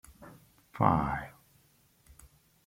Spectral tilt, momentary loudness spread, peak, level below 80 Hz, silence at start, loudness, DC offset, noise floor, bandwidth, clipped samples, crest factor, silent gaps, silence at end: -8 dB/octave; 27 LU; -8 dBFS; -54 dBFS; 0.2 s; -30 LUFS; under 0.1%; -66 dBFS; 16.5 kHz; under 0.1%; 26 dB; none; 1.35 s